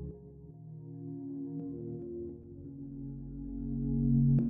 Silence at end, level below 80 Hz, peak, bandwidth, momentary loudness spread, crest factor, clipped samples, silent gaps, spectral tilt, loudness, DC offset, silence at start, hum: 0 s; -46 dBFS; -18 dBFS; 1.1 kHz; 19 LU; 16 dB; under 0.1%; none; -16 dB/octave; -37 LUFS; under 0.1%; 0 s; none